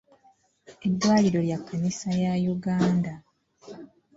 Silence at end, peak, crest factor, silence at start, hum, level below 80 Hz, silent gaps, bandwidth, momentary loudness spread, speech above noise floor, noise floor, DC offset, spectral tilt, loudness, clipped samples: 0.3 s; -10 dBFS; 16 dB; 0.7 s; none; -60 dBFS; none; 7.8 kHz; 24 LU; 38 dB; -62 dBFS; under 0.1%; -6.5 dB/octave; -25 LUFS; under 0.1%